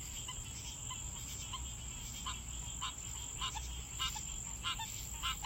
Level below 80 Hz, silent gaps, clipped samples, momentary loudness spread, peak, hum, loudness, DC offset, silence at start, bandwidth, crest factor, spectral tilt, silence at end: -50 dBFS; none; under 0.1%; 5 LU; -26 dBFS; none; -41 LUFS; under 0.1%; 0 s; 16 kHz; 18 dB; -1 dB/octave; 0 s